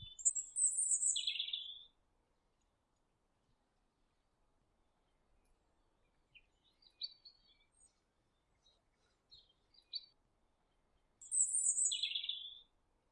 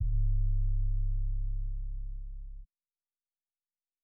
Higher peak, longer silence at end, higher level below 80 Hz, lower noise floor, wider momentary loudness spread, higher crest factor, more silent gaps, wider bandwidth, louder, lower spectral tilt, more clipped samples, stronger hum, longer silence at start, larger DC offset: about the same, -20 dBFS vs -20 dBFS; first, 0.5 s vs 0 s; second, -78 dBFS vs -32 dBFS; second, -81 dBFS vs under -90 dBFS; about the same, 16 LU vs 16 LU; first, 26 dB vs 10 dB; neither; first, 11 kHz vs 0.2 kHz; about the same, -35 LUFS vs -36 LUFS; second, 4 dB/octave vs -30.5 dB/octave; neither; neither; about the same, 0 s vs 0 s; neither